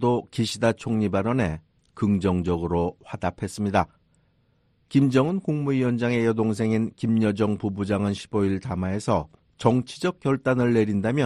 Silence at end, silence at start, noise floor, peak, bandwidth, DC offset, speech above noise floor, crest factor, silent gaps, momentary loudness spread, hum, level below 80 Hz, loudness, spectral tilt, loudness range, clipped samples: 0 s; 0 s; -65 dBFS; -4 dBFS; 11.5 kHz; under 0.1%; 42 dB; 18 dB; none; 7 LU; none; -50 dBFS; -24 LUFS; -7 dB/octave; 3 LU; under 0.1%